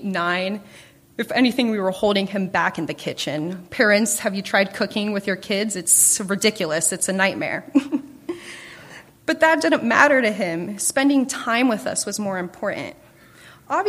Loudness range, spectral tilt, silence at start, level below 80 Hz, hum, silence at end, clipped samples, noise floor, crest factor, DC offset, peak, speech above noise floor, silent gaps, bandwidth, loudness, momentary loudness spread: 4 LU; -3 dB/octave; 0 s; -62 dBFS; none; 0 s; under 0.1%; -47 dBFS; 22 dB; under 0.1%; 0 dBFS; 27 dB; none; 15.5 kHz; -20 LUFS; 14 LU